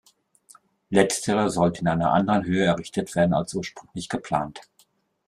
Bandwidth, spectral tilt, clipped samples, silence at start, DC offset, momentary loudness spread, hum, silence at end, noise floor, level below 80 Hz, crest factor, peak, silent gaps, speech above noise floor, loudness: 14 kHz; -5.5 dB/octave; under 0.1%; 0.9 s; under 0.1%; 11 LU; none; 0.65 s; -63 dBFS; -56 dBFS; 22 dB; -4 dBFS; none; 40 dB; -23 LUFS